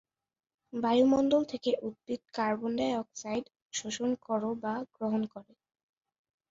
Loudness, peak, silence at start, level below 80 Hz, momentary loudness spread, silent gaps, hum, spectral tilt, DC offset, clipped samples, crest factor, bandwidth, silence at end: -32 LUFS; -14 dBFS; 0.75 s; -70 dBFS; 13 LU; 3.62-3.70 s; none; -4.5 dB/octave; under 0.1%; under 0.1%; 18 dB; 7.8 kHz; 1.1 s